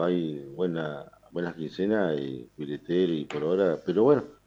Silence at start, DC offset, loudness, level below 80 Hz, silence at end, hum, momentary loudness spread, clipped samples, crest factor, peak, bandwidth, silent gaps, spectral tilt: 0 s; under 0.1%; -28 LUFS; -66 dBFS; 0.15 s; none; 14 LU; under 0.1%; 18 dB; -10 dBFS; 7.8 kHz; none; -8 dB/octave